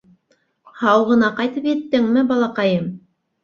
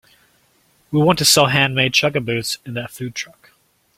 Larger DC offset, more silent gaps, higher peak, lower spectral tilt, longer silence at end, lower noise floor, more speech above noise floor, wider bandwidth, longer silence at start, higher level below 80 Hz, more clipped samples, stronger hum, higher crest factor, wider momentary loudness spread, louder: neither; neither; about the same, -2 dBFS vs 0 dBFS; first, -7 dB/octave vs -3.5 dB/octave; second, 0.45 s vs 0.7 s; first, -64 dBFS vs -59 dBFS; first, 47 dB vs 41 dB; second, 6.8 kHz vs 16.5 kHz; second, 0.75 s vs 0.9 s; second, -60 dBFS vs -54 dBFS; neither; neither; about the same, 18 dB vs 20 dB; second, 7 LU vs 16 LU; about the same, -18 LUFS vs -16 LUFS